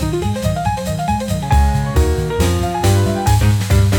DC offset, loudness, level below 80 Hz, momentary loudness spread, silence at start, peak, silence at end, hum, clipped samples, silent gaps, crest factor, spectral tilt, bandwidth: under 0.1%; -16 LUFS; -22 dBFS; 5 LU; 0 s; -2 dBFS; 0 s; none; under 0.1%; none; 12 dB; -6 dB/octave; 19 kHz